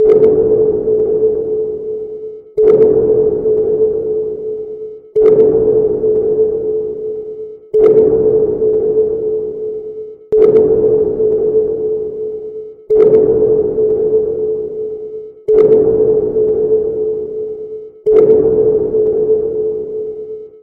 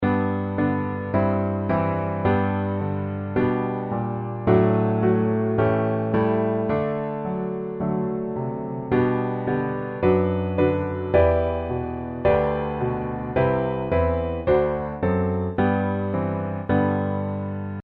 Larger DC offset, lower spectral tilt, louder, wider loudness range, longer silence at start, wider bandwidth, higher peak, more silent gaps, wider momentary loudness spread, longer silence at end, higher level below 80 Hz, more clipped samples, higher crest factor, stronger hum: neither; about the same, -11 dB/octave vs -11.5 dB/octave; first, -13 LUFS vs -23 LUFS; about the same, 2 LU vs 3 LU; about the same, 0 s vs 0 s; second, 2.4 kHz vs 4.7 kHz; first, 0 dBFS vs -4 dBFS; neither; first, 15 LU vs 7 LU; about the same, 0.05 s vs 0 s; about the same, -42 dBFS vs -42 dBFS; neither; second, 12 dB vs 18 dB; neither